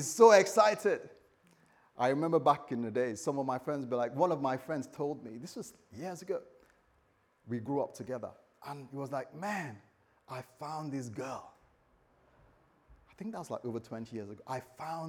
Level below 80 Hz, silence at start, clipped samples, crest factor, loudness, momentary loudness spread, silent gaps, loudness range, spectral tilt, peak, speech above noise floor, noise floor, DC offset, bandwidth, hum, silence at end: -76 dBFS; 0 s; under 0.1%; 24 dB; -33 LUFS; 18 LU; none; 12 LU; -5 dB/octave; -10 dBFS; 39 dB; -71 dBFS; under 0.1%; 18 kHz; none; 0 s